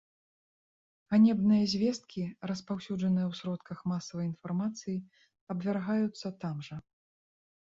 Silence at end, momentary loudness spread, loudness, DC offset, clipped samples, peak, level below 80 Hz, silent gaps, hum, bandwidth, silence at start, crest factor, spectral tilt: 0.95 s; 14 LU; -32 LUFS; under 0.1%; under 0.1%; -14 dBFS; -70 dBFS; 5.41-5.47 s; none; 7.6 kHz; 1.1 s; 18 dB; -6.5 dB/octave